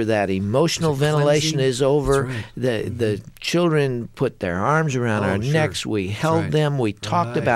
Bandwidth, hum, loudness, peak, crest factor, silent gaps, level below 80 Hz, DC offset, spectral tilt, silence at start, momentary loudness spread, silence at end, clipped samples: 14 kHz; none; -21 LUFS; -4 dBFS; 16 dB; none; -44 dBFS; under 0.1%; -5.5 dB/octave; 0 s; 6 LU; 0 s; under 0.1%